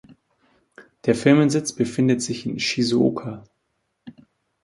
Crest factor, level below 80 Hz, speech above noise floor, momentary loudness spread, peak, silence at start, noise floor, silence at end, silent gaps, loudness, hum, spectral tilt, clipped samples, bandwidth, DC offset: 20 dB; -60 dBFS; 53 dB; 13 LU; -2 dBFS; 0.8 s; -74 dBFS; 0.55 s; none; -21 LUFS; none; -5.5 dB/octave; under 0.1%; 11.5 kHz; under 0.1%